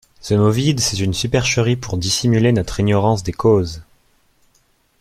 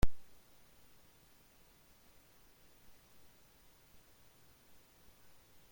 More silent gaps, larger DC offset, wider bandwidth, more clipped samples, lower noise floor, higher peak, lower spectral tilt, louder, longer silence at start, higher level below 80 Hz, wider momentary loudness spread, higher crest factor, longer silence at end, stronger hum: neither; neither; about the same, 15 kHz vs 16.5 kHz; neither; second, -60 dBFS vs -65 dBFS; first, -2 dBFS vs -16 dBFS; about the same, -5 dB/octave vs -5.5 dB/octave; first, -17 LUFS vs -59 LUFS; first, 0.2 s vs 0.05 s; first, -40 dBFS vs -50 dBFS; first, 5 LU vs 0 LU; second, 16 dB vs 24 dB; second, 1.2 s vs 5.5 s; neither